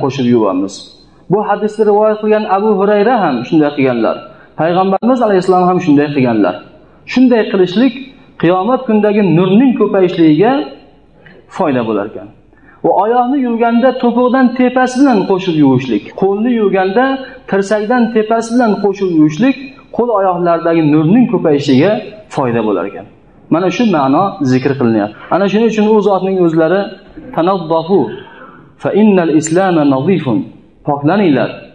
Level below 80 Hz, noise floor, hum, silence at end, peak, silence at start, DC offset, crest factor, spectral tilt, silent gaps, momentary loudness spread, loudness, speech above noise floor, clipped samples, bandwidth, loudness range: -52 dBFS; -42 dBFS; none; 0.05 s; 0 dBFS; 0 s; 0.3%; 12 dB; -7 dB/octave; none; 8 LU; -12 LUFS; 31 dB; under 0.1%; 10 kHz; 2 LU